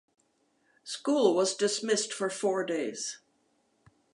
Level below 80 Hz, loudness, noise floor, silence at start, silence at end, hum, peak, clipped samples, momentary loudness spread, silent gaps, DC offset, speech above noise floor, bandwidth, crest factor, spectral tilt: -84 dBFS; -29 LUFS; -72 dBFS; 0.85 s; 0.95 s; none; -10 dBFS; under 0.1%; 13 LU; none; under 0.1%; 43 dB; 11.5 kHz; 22 dB; -3 dB/octave